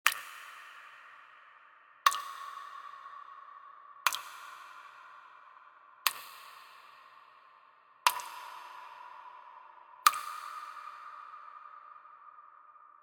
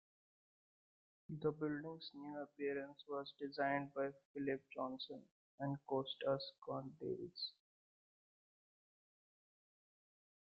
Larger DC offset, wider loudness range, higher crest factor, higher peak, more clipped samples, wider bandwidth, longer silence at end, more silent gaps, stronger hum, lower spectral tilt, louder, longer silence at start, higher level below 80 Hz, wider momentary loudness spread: neither; about the same, 6 LU vs 8 LU; first, 38 dB vs 22 dB; first, 0 dBFS vs -26 dBFS; neither; first, 19.5 kHz vs 5.6 kHz; second, 0.05 s vs 3.05 s; second, none vs 4.25-4.34 s, 5.31-5.58 s; neither; second, 3.5 dB/octave vs -4 dB/octave; first, -34 LUFS vs -45 LUFS; second, 0.05 s vs 1.3 s; second, under -90 dBFS vs -84 dBFS; first, 26 LU vs 9 LU